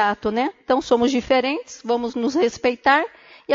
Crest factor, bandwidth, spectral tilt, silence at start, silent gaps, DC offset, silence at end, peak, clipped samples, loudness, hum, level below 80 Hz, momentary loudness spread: 16 dB; 7.6 kHz; -4 dB/octave; 0 s; none; under 0.1%; 0 s; -4 dBFS; under 0.1%; -21 LUFS; none; -54 dBFS; 7 LU